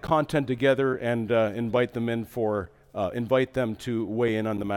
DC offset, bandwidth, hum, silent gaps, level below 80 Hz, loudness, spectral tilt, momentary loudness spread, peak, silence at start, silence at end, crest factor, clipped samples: under 0.1%; 17.5 kHz; none; none; -56 dBFS; -26 LUFS; -7 dB/octave; 6 LU; -10 dBFS; 0.05 s; 0 s; 16 dB; under 0.1%